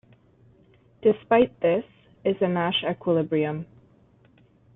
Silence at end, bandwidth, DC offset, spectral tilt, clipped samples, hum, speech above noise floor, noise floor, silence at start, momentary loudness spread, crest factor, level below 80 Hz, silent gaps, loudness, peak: 1.1 s; 4 kHz; under 0.1%; -10 dB/octave; under 0.1%; none; 35 dB; -58 dBFS; 1.05 s; 9 LU; 20 dB; -62 dBFS; none; -24 LUFS; -6 dBFS